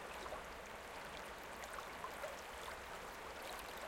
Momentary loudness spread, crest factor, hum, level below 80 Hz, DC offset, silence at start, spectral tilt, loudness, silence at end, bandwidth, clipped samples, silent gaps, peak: 2 LU; 18 dB; none; -64 dBFS; under 0.1%; 0 s; -2.5 dB/octave; -49 LUFS; 0 s; 16.5 kHz; under 0.1%; none; -32 dBFS